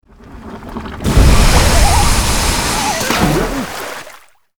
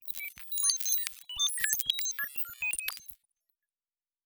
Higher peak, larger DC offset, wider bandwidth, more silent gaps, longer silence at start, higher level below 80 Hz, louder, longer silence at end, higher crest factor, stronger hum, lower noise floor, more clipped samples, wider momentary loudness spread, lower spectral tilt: first, 0 dBFS vs -6 dBFS; neither; about the same, over 20 kHz vs over 20 kHz; neither; first, 0.25 s vs 0 s; first, -16 dBFS vs -68 dBFS; first, -13 LUFS vs -30 LUFS; second, 0.5 s vs 1.1 s; second, 12 dB vs 28 dB; neither; second, -40 dBFS vs under -90 dBFS; neither; first, 17 LU vs 11 LU; first, -4 dB/octave vs 4 dB/octave